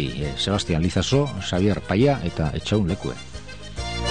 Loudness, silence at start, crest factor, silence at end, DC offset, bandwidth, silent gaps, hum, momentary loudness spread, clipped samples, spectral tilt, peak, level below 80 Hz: -23 LUFS; 0 s; 16 dB; 0 s; 0.9%; 10 kHz; none; none; 14 LU; under 0.1%; -5.5 dB/octave; -6 dBFS; -38 dBFS